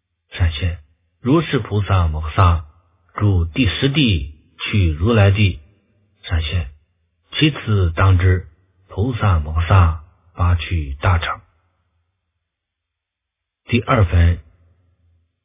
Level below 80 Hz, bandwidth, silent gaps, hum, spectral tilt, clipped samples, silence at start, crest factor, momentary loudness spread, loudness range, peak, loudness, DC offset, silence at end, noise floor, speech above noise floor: -26 dBFS; 3.9 kHz; none; none; -11 dB/octave; under 0.1%; 0.35 s; 18 dB; 12 LU; 5 LU; 0 dBFS; -18 LUFS; under 0.1%; 1.05 s; -81 dBFS; 65 dB